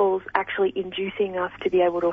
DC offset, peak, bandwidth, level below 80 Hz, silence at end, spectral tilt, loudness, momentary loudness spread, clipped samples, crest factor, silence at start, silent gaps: under 0.1%; -4 dBFS; 3.9 kHz; -58 dBFS; 0 s; -7.5 dB/octave; -24 LUFS; 6 LU; under 0.1%; 20 dB; 0 s; none